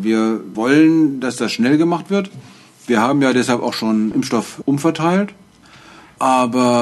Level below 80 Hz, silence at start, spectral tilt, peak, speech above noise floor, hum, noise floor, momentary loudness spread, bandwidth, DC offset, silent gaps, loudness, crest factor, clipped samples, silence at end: -60 dBFS; 0 s; -5.5 dB/octave; -2 dBFS; 28 dB; none; -44 dBFS; 8 LU; 12.5 kHz; under 0.1%; none; -16 LUFS; 14 dB; under 0.1%; 0 s